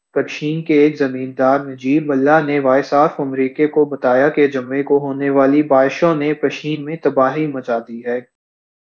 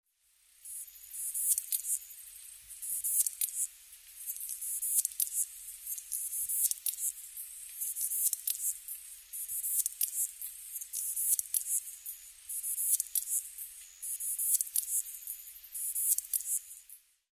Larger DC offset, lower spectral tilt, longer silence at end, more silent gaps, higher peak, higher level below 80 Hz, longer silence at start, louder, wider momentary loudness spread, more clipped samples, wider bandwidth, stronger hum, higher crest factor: neither; first, -7.5 dB/octave vs 5.5 dB/octave; first, 0.75 s vs 0.35 s; neither; first, 0 dBFS vs -10 dBFS; first, -68 dBFS vs -76 dBFS; second, 0.15 s vs 0.6 s; first, -16 LUFS vs -32 LUFS; second, 9 LU vs 14 LU; neither; second, 7 kHz vs 16 kHz; neither; second, 16 dB vs 26 dB